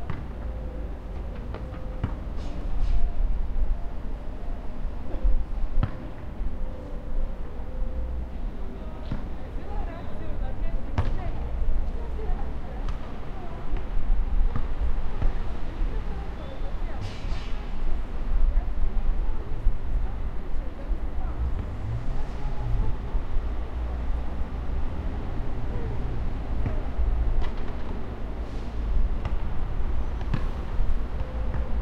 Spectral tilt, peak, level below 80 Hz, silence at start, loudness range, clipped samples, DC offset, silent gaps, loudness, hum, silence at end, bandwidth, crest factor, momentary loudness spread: -8 dB/octave; -8 dBFS; -26 dBFS; 0 s; 3 LU; under 0.1%; under 0.1%; none; -33 LUFS; none; 0 s; 5 kHz; 16 dB; 7 LU